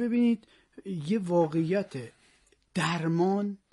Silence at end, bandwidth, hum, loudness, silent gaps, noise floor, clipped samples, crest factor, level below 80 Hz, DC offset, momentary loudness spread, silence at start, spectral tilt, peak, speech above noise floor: 0.15 s; 11.5 kHz; none; -29 LUFS; none; -65 dBFS; under 0.1%; 16 dB; -70 dBFS; under 0.1%; 13 LU; 0 s; -7 dB/octave; -14 dBFS; 37 dB